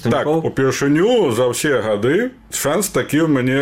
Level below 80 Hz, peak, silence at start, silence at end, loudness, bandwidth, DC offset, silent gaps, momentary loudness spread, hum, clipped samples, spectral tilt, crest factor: -50 dBFS; -6 dBFS; 0 s; 0 s; -17 LUFS; 16.5 kHz; 0.2%; none; 4 LU; none; under 0.1%; -5 dB/octave; 12 dB